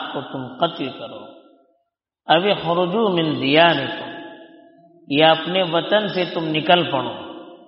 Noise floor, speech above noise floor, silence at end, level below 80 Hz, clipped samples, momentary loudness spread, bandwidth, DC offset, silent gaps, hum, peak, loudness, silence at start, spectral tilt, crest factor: -73 dBFS; 54 dB; 0.1 s; -64 dBFS; under 0.1%; 19 LU; 5.8 kHz; under 0.1%; none; none; 0 dBFS; -19 LUFS; 0 s; -2.5 dB/octave; 20 dB